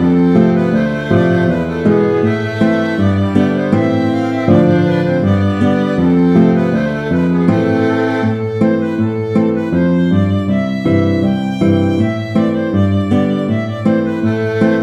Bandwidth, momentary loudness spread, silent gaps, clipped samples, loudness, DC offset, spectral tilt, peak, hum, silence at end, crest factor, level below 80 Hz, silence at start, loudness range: 8.4 kHz; 5 LU; none; under 0.1%; -14 LUFS; under 0.1%; -8.5 dB/octave; 0 dBFS; none; 0 s; 12 dB; -44 dBFS; 0 s; 2 LU